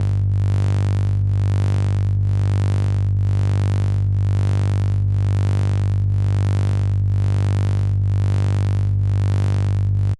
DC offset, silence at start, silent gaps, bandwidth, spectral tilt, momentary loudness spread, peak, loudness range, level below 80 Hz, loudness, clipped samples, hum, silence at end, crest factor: under 0.1%; 0 s; none; 8 kHz; -8 dB/octave; 1 LU; -10 dBFS; 0 LU; -32 dBFS; -19 LUFS; under 0.1%; 50 Hz at -30 dBFS; 0.05 s; 8 dB